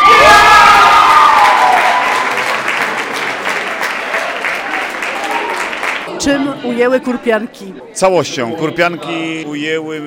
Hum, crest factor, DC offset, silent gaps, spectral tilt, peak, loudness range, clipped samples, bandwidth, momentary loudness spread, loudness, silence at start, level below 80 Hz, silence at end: none; 12 dB; under 0.1%; none; -3 dB/octave; 0 dBFS; 8 LU; under 0.1%; 18.5 kHz; 14 LU; -11 LUFS; 0 s; -42 dBFS; 0 s